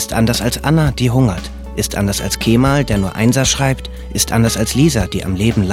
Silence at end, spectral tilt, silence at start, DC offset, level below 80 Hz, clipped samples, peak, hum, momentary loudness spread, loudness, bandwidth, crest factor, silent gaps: 0 s; -5 dB/octave; 0 s; under 0.1%; -28 dBFS; under 0.1%; 0 dBFS; none; 7 LU; -15 LUFS; 16.5 kHz; 14 dB; none